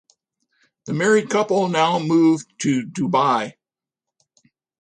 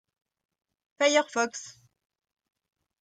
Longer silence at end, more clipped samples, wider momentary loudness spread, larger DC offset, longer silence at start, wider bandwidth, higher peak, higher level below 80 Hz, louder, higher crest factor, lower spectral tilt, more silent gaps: about the same, 1.3 s vs 1.35 s; neither; second, 7 LU vs 18 LU; neither; second, 0.85 s vs 1 s; about the same, 10 kHz vs 9.6 kHz; first, -4 dBFS vs -10 dBFS; first, -66 dBFS vs -82 dBFS; first, -19 LUFS vs -26 LUFS; second, 16 dB vs 22 dB; first, -5.5 dB/octave vs -1 dB/octave; neither